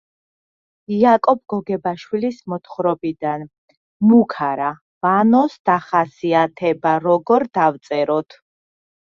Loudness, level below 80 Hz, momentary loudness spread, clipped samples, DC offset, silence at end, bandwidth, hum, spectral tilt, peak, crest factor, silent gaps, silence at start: -18 LUFS; -64 dBFS; 10 LU; under 0.1%; under 0.1%; 0.95 s; 6.8 kHz; none; -8 dB/octave; -2 dBFS; 16 dB; 3.58-3.68 s, 3.77-4.00 s, 4.81-5.01 s, 5.59-5.65 s; 0.9 s